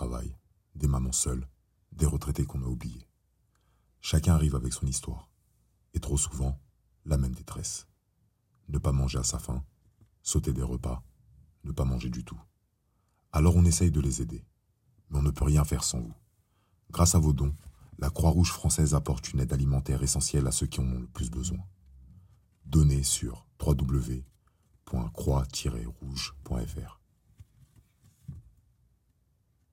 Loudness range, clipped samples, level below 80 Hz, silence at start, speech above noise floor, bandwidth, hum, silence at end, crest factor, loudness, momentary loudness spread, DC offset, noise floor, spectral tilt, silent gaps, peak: 7 LU; under 0.1%; -38 dBFS; 0 s; 45 dB; 16 kHz; none; 1.3 s; 20 dB; -29 LUFS; 16 LU; under 0.1%; -73 dBFS; -5 dB/octave; none; -10 dBFS